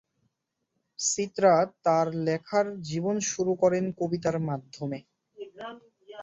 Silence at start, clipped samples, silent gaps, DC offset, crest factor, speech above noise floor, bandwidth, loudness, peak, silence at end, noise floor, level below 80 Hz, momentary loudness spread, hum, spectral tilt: 1 s; under 0.1%; none; under 0.1%; 20 dB; 54 dB; 8.4 kHz; -27 LUFS; -8 dBFS; 0 s; -81 dBFS; -68 dBFS; 18 LU; none; -4.5 dB/octave